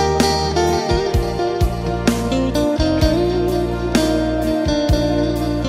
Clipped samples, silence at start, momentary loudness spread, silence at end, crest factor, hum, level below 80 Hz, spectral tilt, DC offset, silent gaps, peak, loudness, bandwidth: under 0.1%; 0 s; 3 LU; 0 s; 16 dB; none; -26 dBFS; -5.5 dB/octave; under 0.1%; none; -2 dBFS; -18 LUFS; 16 kHz